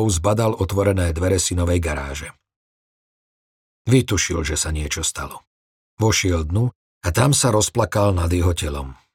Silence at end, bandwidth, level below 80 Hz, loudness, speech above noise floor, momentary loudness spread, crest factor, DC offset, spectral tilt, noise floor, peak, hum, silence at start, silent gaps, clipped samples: 0.2 s; 16.5 kHz; -36 dBFS; -20 LUFS; over 71 dB; 12 LU; 18 dB; under 0.1%; -4.5 dB/octave; under -90 dBFS; -2 dBFS; none; 0 s; 2.56-3.85 s, 5.47-5.97 s, 6.75-7.01 s; under 0.1%